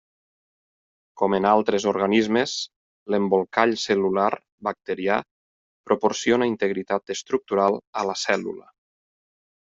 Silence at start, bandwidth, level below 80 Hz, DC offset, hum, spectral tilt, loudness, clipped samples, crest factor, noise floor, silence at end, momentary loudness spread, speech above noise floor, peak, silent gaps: 1.15 s; 7.8 kHz; -66 dBFS; under 0.1%; none; -4.5 dB/octave; -23 LUFS; under 0.1%; 22 dB; under -90 dBFS; 1.15 s; 8 LU; over 67 dB; -2 dBFS; 2.76-3.06 s, 4.52-4.58 s, 5.31-5.84 s, 7.87-7.93 s